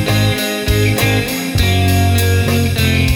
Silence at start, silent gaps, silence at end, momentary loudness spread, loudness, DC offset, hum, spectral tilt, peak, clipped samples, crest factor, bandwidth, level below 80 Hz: 0 s; none; 0 s; 3 LU; -14 LUFS; under 0.1%; none; -5 dB/octave; -2 dBFS; under 0.1%; 10 dB; over 20 kHz; -26 dBFS